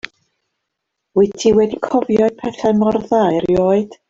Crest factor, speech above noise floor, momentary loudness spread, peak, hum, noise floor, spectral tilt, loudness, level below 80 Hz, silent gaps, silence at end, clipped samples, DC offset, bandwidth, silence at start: 14 dB; 62 dB; 5 LU; -2 dBFS; none; -77 dBFS; -6.5 dB/octave; -16 LUFS; -48 dBFS; none; 0.15 s; under 0.1%; under 0.1%; 7.8 kHz; 1.15 s